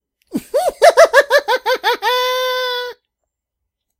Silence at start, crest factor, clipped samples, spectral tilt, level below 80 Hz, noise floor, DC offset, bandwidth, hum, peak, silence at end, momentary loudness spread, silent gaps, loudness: 0.35 s; 16 dB; under 0.1%; -1 dB/octave; -58 dBFS; -79 dBFS; under 0.1%; 16.5 kHz; none; 0 dBFS; 1.05 s; 15 LU; none; -14 LUFS